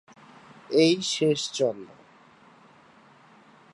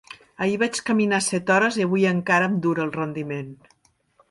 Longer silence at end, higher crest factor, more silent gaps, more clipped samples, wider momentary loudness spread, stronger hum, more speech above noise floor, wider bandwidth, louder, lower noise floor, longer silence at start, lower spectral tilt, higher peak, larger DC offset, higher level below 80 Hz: first, 1.85 s vs 0.75 s; about the same, 20 dB vs 18 dB; neither; neither; first, 15 LU vs 11 LU; neither; second, 31 dB vs 40 dB; about the same, 11.5 kHz vs 11.5 kHz; about the same, -24 LUFS vs -22 LUFS; second, -55 dBFS vs -62 dBFS; first, 0.7 s vs 0.1 s; about the same, -4 dB/octave vs -5 dB/octave; second, -10 dBFS vs -6 dBFS; neither; second, -78 dBFS vs -66 dBFS